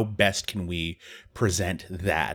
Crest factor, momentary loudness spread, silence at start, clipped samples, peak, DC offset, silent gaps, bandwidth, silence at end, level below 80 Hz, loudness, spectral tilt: 22 dB; 11 LU; 0 s; under 0.1%; -4 dBFS; under 0.1%; none; 19 kHz; 0 s; -46 dBFS; -27 LUFS; -4 dB/octave